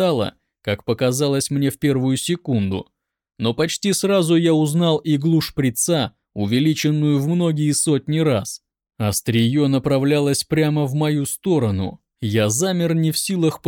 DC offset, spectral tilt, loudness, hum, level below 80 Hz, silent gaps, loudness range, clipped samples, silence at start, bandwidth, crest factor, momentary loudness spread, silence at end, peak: under 0.1%; -5.5 dB/octave; -19 LUFS; none; -54 dBFS; none; 2 LU; under 0.1%; 0 s; 19 kHz; 12 dB; 8 LU; 0 s; -6 dBFS